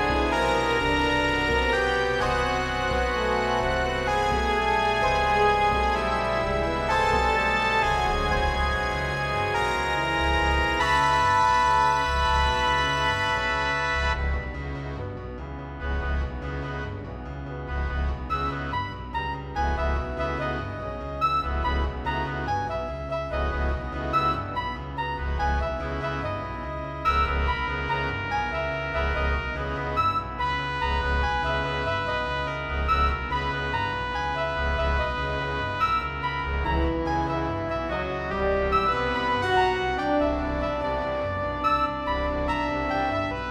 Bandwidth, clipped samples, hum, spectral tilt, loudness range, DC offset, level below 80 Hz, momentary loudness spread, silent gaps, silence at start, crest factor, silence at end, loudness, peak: 12.5 kHz; under 0.1%; none; -5 dB/octave; 7 LU; under 0.1%; -34 dBFS; 9 LU; none; 0 s; 16 dB; 0 s; -25 LUFS; -10 dBFS